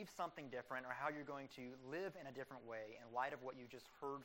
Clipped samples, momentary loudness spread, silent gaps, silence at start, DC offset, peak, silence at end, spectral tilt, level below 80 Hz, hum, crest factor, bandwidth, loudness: under 0.1%; 8 LU; none; 0 s; under 0.1%; -30 dBFS; 0 s; -5 dB/octave; -84 dBFS; none; 20 dB; 16 kHz; -50 LUFS